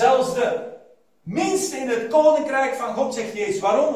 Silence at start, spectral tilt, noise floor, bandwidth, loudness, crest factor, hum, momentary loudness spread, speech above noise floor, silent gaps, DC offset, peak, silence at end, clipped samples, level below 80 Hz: 0 s; -4 dB/octave; -52 dBFS; 16 kHz; -21 LUFS; 18 dB; none; 11 LU; 31 dB; none; under 0.1%; -4 dBFS; 0 s; under 0.1%; -64 dBFS